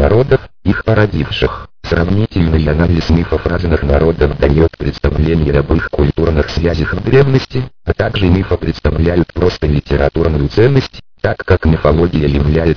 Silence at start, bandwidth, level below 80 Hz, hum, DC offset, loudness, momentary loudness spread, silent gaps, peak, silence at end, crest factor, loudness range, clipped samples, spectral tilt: 0 s; 5.4 kHz; -22 dBFS; none; 1%; -13 LUFS; 6 LU; none; 0 dBFS; 0 s; 12 dB; 1 LU; under 0.1%; -8.5 dB/octave